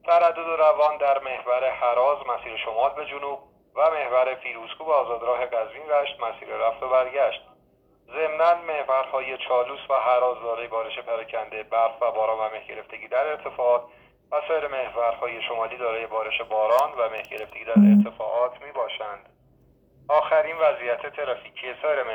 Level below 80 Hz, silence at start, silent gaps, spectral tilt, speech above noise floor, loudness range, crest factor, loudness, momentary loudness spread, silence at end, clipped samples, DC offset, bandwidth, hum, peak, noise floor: -64 dBFS; 0.05 s; none; -7.5 dB/octave; 38 dB; 4 LU; 18 dB; -24 LUFS; 12 LU; 0 s; under 0.1%; under 0.1%; 17 kHz; none; -6 dBFS; -61 dBFS